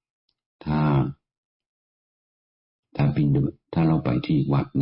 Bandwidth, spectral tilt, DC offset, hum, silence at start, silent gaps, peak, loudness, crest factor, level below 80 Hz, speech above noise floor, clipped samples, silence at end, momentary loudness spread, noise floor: 5.4 kHz; -12.5 dB/octave; under 0.1%; none; 0.65 s; 1.38-1.60 s, 1.66-2.83 s; -12 dBFS; -23 LUFS; 12 dB; -48 dBFS; over 69 dB; under 0.1%; 0 s; 7 LU; under -90 dBFS